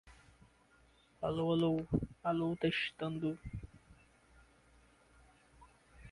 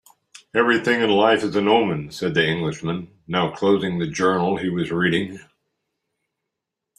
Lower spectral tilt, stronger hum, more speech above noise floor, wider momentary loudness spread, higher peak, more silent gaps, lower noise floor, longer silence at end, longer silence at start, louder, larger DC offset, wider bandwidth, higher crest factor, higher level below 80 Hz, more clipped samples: first, -7.5 dB/octave vs -5.5 dB/octave; neither; second, 32 dB vs 63 dB; first, 14 LU vs 8 LU; second, -22 dBFS vs -2 dBFS; neither; second, -68 dBFS vs -83 dBFS; second, 0 s vs 1.6 s; second, 0.05 s vs 0.55 s; second, -37 LUFS vs -20 LUFS; neither; about the same, 11.5 kHz vs 12.5 kHz; about the same, 18 dB vs 20 dB; about the same, -58 dBFS vs -58 dBFS; neither